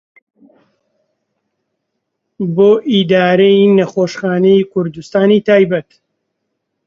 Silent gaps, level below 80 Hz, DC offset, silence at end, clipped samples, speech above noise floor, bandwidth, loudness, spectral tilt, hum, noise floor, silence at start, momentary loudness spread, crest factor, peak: none; -58 dBFS; under 0.1%; 1.05 s; under 0.1%; 61 dB; 7.4 kHz; -12 LUFS; -7 dB/octave; none; -73 dBFS; 2.4 s; 9 LU; 14 dB; 0 dBFS